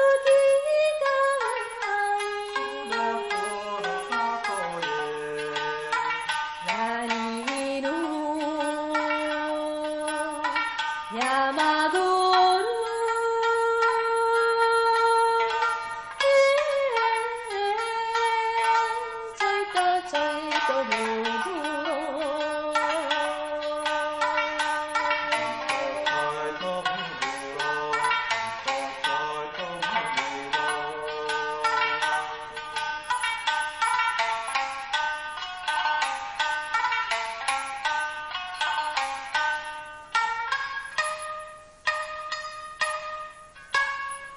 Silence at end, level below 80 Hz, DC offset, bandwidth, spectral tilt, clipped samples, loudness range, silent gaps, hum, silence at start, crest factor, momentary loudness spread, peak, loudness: 0 s; -62 dBFS; under 0.1%; 12.5 kHz; -2 dB/octave; under 0.1%; 6 LU; none; none; 0 s; 16 dB; 8 LU; -10 dBFS; -26 LUFS